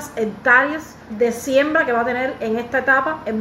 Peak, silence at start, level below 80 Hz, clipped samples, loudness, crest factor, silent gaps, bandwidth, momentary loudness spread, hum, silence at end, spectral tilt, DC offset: -2 dBFS; 0 s; -56 dBFS; under 0.1%; -18 LUFS; 18 dB; none; 16 kHz; 9 LU; none; 0 s; -4.5 dB/octave; under 0.1%